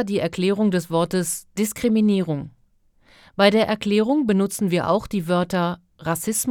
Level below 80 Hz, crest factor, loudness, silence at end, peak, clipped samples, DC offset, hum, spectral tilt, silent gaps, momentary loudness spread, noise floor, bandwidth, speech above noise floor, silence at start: -54 dBFS; 18 dB; -21 LUFS; 0 s; -2 dBFS; under 0.1%; under 0.1%; none; -5 dB/octave; none; 9 LU; -59 dBFS; 18 kHz; 39 dB; 0 s